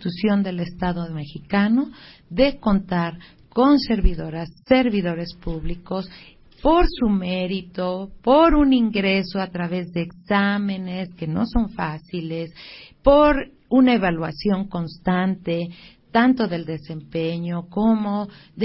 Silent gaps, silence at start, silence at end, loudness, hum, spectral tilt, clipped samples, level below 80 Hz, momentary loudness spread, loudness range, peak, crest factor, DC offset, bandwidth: none; 0 s; 0 s; -21 LUFS; none; -11 dB/octave; under 0.1%; -34 dBFS; 14 LU; 4 LU; -2 dBFS; 18 dB; under 0.1%; 5.8 kHz